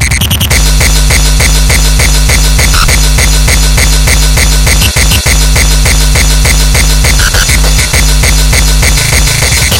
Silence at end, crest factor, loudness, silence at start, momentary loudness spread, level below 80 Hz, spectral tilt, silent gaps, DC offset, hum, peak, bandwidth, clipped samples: 0 s; 6 dB; -6 LUFS; 0 s; 1 LU; -8 dBFS; -2.5 dB/octave; none; under 0.1%; none; 0 dBFS; 17 kHz; 0.4%